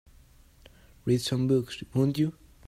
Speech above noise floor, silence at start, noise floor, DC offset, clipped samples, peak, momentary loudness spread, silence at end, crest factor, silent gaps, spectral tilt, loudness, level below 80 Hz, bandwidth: 30 dB; 1.05 s; -56 dBFS; under 0.1%; under 0.1%; -12 dBFS; 6 LU; 0.35 s; 16 dB; none; -6.5 dB/octave; -28 LUFS; -56 dBFS; 15.5 kHz